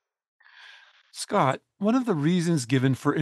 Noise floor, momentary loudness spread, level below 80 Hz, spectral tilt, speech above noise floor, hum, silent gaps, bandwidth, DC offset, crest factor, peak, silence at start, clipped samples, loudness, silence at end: -53 dBFS; 5 LU; -74 dBFS; -6 dB/octave; 29 dB; none; none; 12.5 kHz; under 0.1%; 18 dB; -8 dBFS; 0.65 s; under 0.1%; -25 LUFS; 0 s